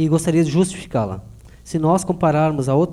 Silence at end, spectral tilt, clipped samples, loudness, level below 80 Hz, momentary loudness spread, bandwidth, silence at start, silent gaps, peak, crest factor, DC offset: 0 s; -7 dB/octave; under 0.1%; -19 LUFS; -44 dBFS; 9 LU; 12.5 kHz; 0 s; none; -4 dBFS; 14 dB; under 0.1%